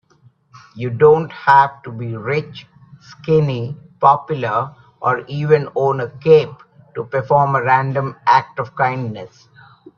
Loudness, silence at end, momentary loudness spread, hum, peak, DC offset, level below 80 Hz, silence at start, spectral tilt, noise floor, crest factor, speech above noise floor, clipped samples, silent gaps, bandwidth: -16 LUFS; 0.7 s; 16 LU; none; 0 dBFS; under 0.1%; -56 dBFS; 0.75 s; -8 dB/octave; -53 dBFS; 18 dB; 37 dB; under 0.1%; none; 6.8 kHz